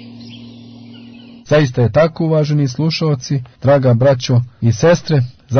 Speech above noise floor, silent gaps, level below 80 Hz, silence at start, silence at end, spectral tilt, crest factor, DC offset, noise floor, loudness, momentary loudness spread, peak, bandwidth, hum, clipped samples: 24 dB; none; -46 dBFS; 0 s; 0 s; -7 dB/octave; 12 dB; under 0.1%; -37 dBFS; -14 LUFS; 9 LU; -2 dBFS; 6.6 kHz; none; under 0.1%